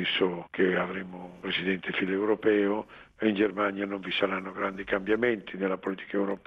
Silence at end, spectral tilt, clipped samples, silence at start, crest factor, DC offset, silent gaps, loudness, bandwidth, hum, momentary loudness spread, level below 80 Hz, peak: 0.1 s; -7.5 dB/octave; under 0.1%; 0 s; 18 dB; under 0.1%; none; -29 LUFS; 6.4 kHz; none; 7 LU; -64 dBFS; -12 dBFS